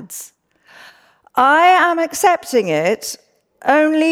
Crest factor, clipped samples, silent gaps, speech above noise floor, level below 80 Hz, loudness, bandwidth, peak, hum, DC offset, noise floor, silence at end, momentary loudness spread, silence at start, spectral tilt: 14 dB; under 0.1%; none; 33 dB; -64 dBFS; -15 LUFS; 17.5 kHz; -2 dBFS; none; under 0.1%; -47 dBFS; 0 s; 18 LU; 0 s; -3.5 dB/octave